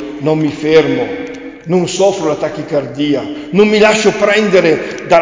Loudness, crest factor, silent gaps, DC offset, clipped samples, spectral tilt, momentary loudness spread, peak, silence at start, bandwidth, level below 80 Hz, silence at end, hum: -12 LUFS; 12 dB; none; under 0.1%; under 0.1%; -5 dB/octave; 9 LU; 0 dBFS; 0 s; 7.6 kHz; -48 dBFS; 0 s; none